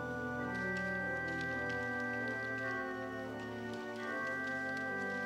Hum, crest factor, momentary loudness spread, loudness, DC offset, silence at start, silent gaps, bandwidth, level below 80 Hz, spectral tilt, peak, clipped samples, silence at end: none; 12 dB; 6 LU; -38 LUFS; under 0.1%; 0 s; none; 16 kHz; -64 dBFS; -5.5 dB/octave; -26 dBFS; under 0.1%; 0 s